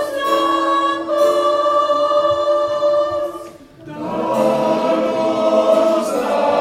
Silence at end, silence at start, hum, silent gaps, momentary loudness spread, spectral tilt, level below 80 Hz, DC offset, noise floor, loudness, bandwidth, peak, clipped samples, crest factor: 0 s; 0 s; none; none; 8 LU; -4.5 dB/octave; -56 dBFS; under 0.1%; -36 dBFS; -16 LUFS; 15.5 kHz; -2 dBFS; under 0.1%; 14 dB